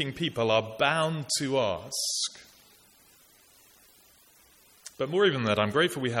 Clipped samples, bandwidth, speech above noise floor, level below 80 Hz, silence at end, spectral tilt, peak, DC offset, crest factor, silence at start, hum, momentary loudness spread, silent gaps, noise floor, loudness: under 0.1%; 17 kHz; 32 dB; -66 dBFS; 0 s; -3.5 dB/octave; -8 dBFS; under 0.1%; 22 dB; 0 s; none; 7 LU; none; -59 dBFS; -27 LUFS